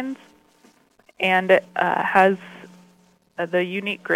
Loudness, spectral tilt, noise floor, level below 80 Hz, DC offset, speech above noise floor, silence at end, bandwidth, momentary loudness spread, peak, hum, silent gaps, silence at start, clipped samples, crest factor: -21 LUFS; -6 dB/octave; -58 dBFS; -68 dBFS; under 0.1%; 37 dB; 0 s; 16 kHz; 19 LU; -4 dBFS; none; none; 0 s; under 0.1%; 20 dB